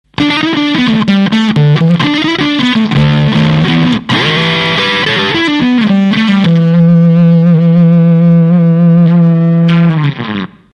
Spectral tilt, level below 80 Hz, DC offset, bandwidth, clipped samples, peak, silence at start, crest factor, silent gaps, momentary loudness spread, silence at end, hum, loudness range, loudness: -7 dB/octave; -40 dBFS; under 0.1%; 6.8 kHz; under 0.1%; 0 dBFS; 0.2 s; 8 dB; none; 4 LU; 0.3 s; none; 3 LU; -8 LUFS